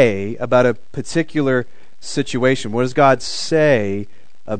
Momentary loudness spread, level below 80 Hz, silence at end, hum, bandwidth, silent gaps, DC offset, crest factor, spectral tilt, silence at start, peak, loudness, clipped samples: 13 LU; -52 dBFS; 0 s; none; 9.4 kHz; none; 4%; 18 dB; -5.5 dB/octave; 0 s; 0 dBFS; -18 LUFS; under 0.1%